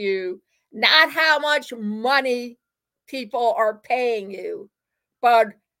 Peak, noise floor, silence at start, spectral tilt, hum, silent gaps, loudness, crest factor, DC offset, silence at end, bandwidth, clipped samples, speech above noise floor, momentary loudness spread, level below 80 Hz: -2 dBFS; -60 dBFS; 0 s; -3 dB/octave; none; none; -20 LUFS; 20 dB; under 0.1%; 0.3 s; 17 kHz; under 0.1%; 39 dB; 18 LU; -80 dBFS